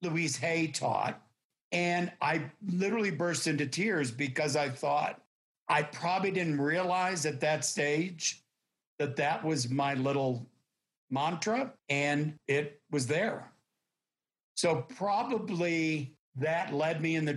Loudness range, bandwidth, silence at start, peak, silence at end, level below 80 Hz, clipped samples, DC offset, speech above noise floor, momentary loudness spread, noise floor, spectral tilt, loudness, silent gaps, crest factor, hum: 3 LU; 12.5 kHz; 0 s; -16 dBFS; 0 s; -80 dBFS; under 0.1%; under 0.1%; over 59 dB; 6 LU; under -90 dBFS; -4.5 dB/octave; -31 LUFS; 1.45-1.50 s, 1.61-1.71 s, 5.26-5.66 s, 8.87-8.98 s, 10.97-11.08 s, 14.43-14.55 s, 16.19-16.32 s; 16 dB; none